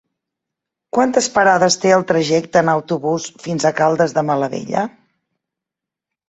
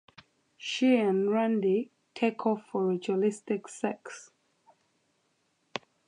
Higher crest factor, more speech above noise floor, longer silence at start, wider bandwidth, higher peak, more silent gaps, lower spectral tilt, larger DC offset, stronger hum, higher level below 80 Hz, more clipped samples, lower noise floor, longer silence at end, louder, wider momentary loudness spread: about the same, 18 dB vs 18 dB; first, 69 dB vs 46 dB; first, 0.95 s vs 0.6 s; second, 8.2 kHz vs 10.5 kHz; first, 0 dBFS vs -12 dBFS; neither; about the same, -4.5 dB/octave vs -5.5 dB/octave; neither; neither; first, -60 dBFS vs -84 dBFS; neither; first, -85 dBFS vs -74 dBFS; first, 1.4 s vs 0.3 s; first, -16 LUFS vs -29 LUFS; second, 9 LU vs 16 LU